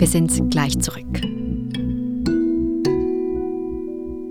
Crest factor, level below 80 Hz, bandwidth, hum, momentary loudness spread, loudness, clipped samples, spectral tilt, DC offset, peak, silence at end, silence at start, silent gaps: 16 dB; -34 dBFS; 19 kHz; none; 9 LU; -22 LUFS; under 0.1%; -5.5 dB/octave; under 0.1%; -4 dBFS; 0 s; 0 s; none